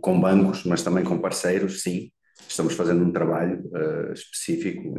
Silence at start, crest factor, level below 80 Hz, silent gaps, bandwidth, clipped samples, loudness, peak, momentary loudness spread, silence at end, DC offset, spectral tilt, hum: 0.05 s; 18 dB; -58 dBFS; none; 12.5 kHz; under 0.1%; -24 LUFS; -6 dBFS; 11 LU; 0 s; under 0.1%; -6 dB/octave; none